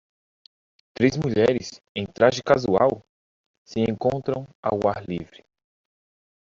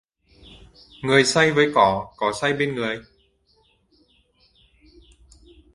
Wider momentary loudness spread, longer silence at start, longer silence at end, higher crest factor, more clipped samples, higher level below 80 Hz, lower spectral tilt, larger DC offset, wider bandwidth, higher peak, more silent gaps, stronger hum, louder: about the same, 13 LU vs 11 LU; about the same, 1 s vs 1 s; second, 1.25 s vs 2.75 s; about the same, 22 dB vs 24 dB; neither; about the same, -56 dBFS vs -54 dBFS; first, -5.5 dB/octave vs -4 dB/octave; neither; second, 7.6 kHz vs 11.5 kHz; about the same, -2 dBFS vs 0 dBFS; first, 1.89-1.95 s, 3.09-3.65 s, 4.55-4.63 s vs none; neither; second, -23 LUFS vs -20 LUFS